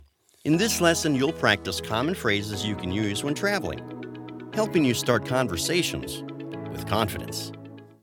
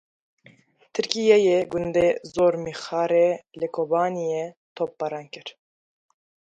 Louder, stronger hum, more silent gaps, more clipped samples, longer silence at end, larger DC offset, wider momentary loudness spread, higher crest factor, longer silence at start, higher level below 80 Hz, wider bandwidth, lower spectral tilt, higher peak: about the same, -25 LUFS vs -23 LUFS; neither; second, none vs 4.57-4.76 s; neither; second, 0.15 s vs 1.05 s; neither; about the same, 14 LU vs 14 LU; about the same, 24 dB vs 24 dB; second, 0.45 s vs 0.95 s; first, -52 dBFS vs -60 dBFS; first, 19 kHz vs 9.2 kHz; about the same, -4 dB/octave vs -5 dB/octave; second, -4 dBFS vs 0 dBFS